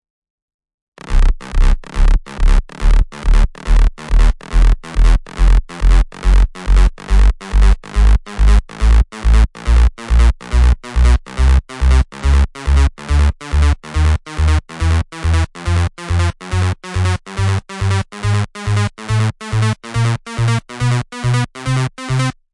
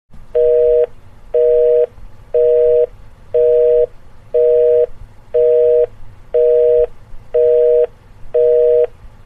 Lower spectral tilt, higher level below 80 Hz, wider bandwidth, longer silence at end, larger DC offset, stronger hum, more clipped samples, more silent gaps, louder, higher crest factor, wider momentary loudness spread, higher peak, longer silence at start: about the same, -6 dB/octave vs -7 dB/octave; first, -14 dBFS vs -38 dBFS; first, 11 kHz vs 3.5 kHz; about the same, 0.2 s vs 0.2 s; neither; neither; neither; neither; second, -17 LUFS vs -14 LUFS; about the same, 12 dB vs 10 dB; second, 4 LU vs 9 LU; first, 0 dBFS vs -4 dBFS; first, 1.05 s vs 0.1 s